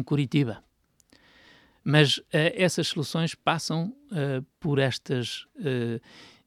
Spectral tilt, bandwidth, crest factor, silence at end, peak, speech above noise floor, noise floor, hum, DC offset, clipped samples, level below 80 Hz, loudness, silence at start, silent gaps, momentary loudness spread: -5 dB/octave; 14.5 kHz; 22 dB; 0.2 s; -6 dBFS; 36 dB; -63 dBFS; none; under 0.1%; under 0.1%; -66 dBFS; -26 LUFS; 0 s; none; 11 LU